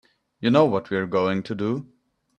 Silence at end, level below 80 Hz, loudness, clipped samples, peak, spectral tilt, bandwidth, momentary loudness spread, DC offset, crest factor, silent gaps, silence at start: 0.55 s; -64 dBFS; -23 LUFS; under 0.1%; -4 dBFS; -7.5 dB/octave; 9.2 kHz; 9 LU; under 0.1%; 20 dB; none; 0.4 s